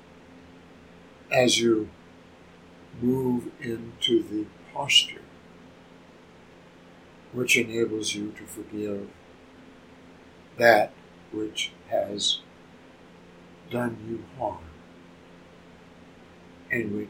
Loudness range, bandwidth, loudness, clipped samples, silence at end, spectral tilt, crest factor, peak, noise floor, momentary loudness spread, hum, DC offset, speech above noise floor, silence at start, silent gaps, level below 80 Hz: 10 LU; 16.5 kHz; -26 LUFS; under 0.1%; 0 s; -3 dB/octave; 28 dB; -2 dBFS; -51 dBFS; 19 LU; none; under 0.1%; 25 dB; 0.3 s; none; -62 dBFS